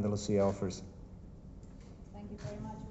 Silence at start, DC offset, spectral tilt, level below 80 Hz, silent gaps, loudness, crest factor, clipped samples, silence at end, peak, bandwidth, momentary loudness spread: 0 s; under 0.1%; -6.5 dB/octave; -54 dBFS; none; -36 LUFS; 18 dB; under 0.1%; 0 s; -20 dBFS; 8.2 kHz; 21 LU